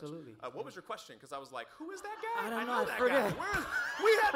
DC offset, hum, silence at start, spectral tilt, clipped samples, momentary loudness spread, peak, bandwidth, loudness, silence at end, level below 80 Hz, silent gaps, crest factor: under 0.1%; none; 0 s; -4 dB/octave; under 0.1%; 16 LU; -16 dBFS; 16 kHz; -33 LUFS; 0 s; -62 dBFS; none; 18 dB